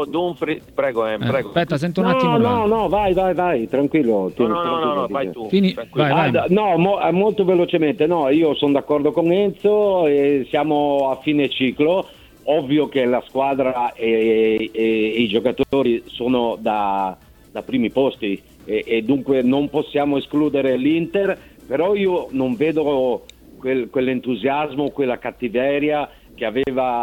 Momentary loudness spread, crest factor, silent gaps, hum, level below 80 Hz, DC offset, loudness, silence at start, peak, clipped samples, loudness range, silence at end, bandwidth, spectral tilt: 7 LU; 16 dB; none; none; -50 dBFS; under 0.1%; -19 LUFS; 0 s; -2 dBFS; under 0.1%; 4 LU; 0 s; 16 kHz; -7.5 dB/octave